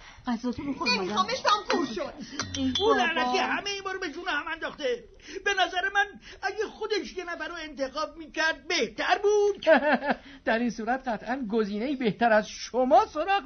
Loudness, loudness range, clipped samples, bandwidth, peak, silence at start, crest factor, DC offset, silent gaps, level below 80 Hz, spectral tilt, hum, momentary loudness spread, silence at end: -27 LUFS; 4 LU; under 0.1%; 6.6 kHz; -8 dBFS; 0 s; 20 dB; under 0.1%; none; -56 dBFS; -3.5 dB/octave; none; 11 LU; 0 s